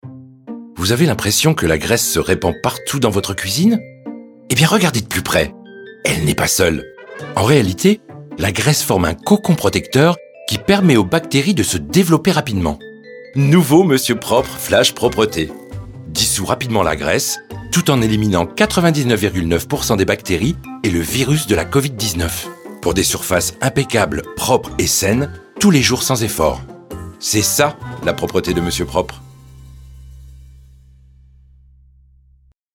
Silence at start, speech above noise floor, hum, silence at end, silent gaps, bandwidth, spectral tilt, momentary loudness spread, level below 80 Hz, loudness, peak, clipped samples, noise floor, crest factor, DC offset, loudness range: 0.05 s; 37 dB; none; 2.35 s; none; 19 kHz; -4.5 dB/octave; 12 LU; -38 dBFS; -16 LUFS; 0 dBFS; under 0.1%; -53 dBFS; 16 dB; under 0.1%; 3 LU